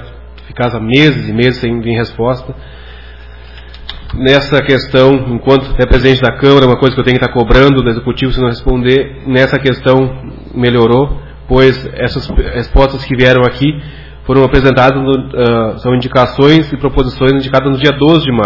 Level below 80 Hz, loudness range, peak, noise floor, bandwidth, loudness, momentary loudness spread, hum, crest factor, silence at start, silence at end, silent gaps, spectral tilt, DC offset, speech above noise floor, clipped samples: -22 dBFS; 5 LU; 0 dBFS; -31 dBFS; 6 kHz; -10 LUFS; 9 LU; none; 10 dB; 0 s; 0 s; none; -7.5 dB/octave; 1%; 21 dB; 2%